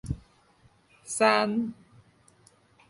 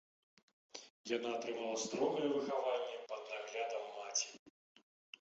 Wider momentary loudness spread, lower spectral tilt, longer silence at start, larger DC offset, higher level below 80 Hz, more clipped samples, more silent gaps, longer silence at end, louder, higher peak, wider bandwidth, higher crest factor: about the same, 16 LU vs 15 LU; first, -4 dB/octave vs -2 dB/octave; second, 0.05 s vs 0.75 s; neither; first, -52 dBFS vs -88 dBFS; neither; second, none vs 0.90-1.04 s, 4.39-4.46 s; first, 1.15 s vs 0.7 s; first, -27 LUFS vs -40 LUFS; first, -8 dBFS vs -24 dBFS; first, 11.5 kHz vs 8 kHz; first, 24 dB vs 18 dB